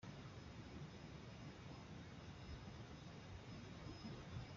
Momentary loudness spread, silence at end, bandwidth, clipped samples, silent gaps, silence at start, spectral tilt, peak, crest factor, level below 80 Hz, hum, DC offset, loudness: 3 LU; 0 s; 7.4 kHz; under 0.1%; none; 0 s; -5.5 dB/octave; -40 dBFS; 16 dB; -66 dBFS; none; under 0.1%; -56 LUFS